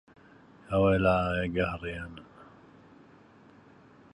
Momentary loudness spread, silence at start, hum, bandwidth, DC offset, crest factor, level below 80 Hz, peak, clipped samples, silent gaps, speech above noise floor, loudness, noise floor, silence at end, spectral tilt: 18 LU; 0.7 s; none; 10.5 kHz; under 0.1%; 20 dB; -48 dBFS; -10 dBFS; under 0.1%; none; 29 dB; -28 LUFS; -56 dBFS; 1.7 s; -8 dB/octave